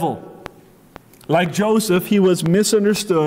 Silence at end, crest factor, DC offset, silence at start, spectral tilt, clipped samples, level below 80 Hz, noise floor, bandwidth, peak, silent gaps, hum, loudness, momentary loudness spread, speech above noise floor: 0 s; 12 dB; under 0.1%; 0 s; -5 dB/octave; under 0.1%; -56 dBFS; -45 dBFS; 16.5 kHz; -6 dBFS; none; none; -17 LUFS; 9 LU; 29 dB